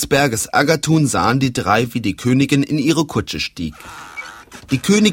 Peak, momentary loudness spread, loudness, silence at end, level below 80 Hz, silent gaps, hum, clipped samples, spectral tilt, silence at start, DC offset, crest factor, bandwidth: 0 dBFS; 16 LU; -17 LUFS; 0 s; -44 dBFS; none; none; under 0.1%; -5 dB/octave; 0 s; under 0.1%; 16 dB; 16.5 kHz